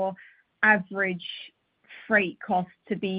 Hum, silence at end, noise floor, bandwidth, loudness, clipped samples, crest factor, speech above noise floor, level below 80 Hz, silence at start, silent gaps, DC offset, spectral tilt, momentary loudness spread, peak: none; 0 s; -51 dBFS; 5.2 kHz; -25 LUFS; under 0.1%; 20 dB; 25 dB; -70 dBFS; 0 s; none; under 0.1%; -9 dB/octave; 23 LU; -6 dBFS